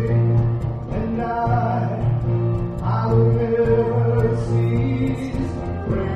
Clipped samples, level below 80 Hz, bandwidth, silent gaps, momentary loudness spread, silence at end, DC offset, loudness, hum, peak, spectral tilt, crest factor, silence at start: under 0.1%; -34 dBFS; 5.6 kHz; none; 7 LU; 0 s; under 0.1%; -21 LUFS; none; -4 dBFS; -10 dB/octave; 14 dB; 0 s